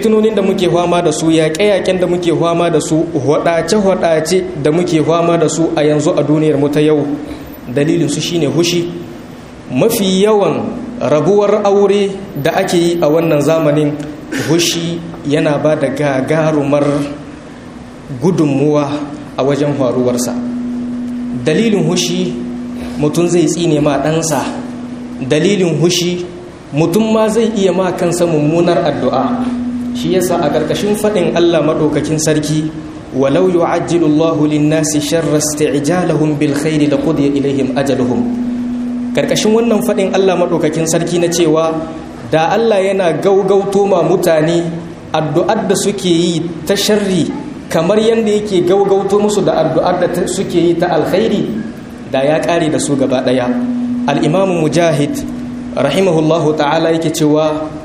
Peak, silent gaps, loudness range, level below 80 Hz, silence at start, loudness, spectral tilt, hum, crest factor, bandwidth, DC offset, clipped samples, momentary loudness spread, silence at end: 0 dBFS; none; 3 LU; -44 dBFS; 0 s; -13 LUFS; -5.5 dB/octave; none; 12 dB; 15 kHz; under 0.1%; under 0.1%; 9 LU; 0 s